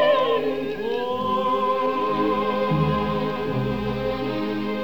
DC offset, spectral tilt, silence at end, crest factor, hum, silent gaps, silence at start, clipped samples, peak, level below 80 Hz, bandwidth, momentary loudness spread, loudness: 0.8%; -7.5 dB/octave; 0 s; 14 dB; none; none; 0 s; under 0.1%; -8 dBFS; -46 dBFS; over 20 kHz; 5 LU; -23 LUFS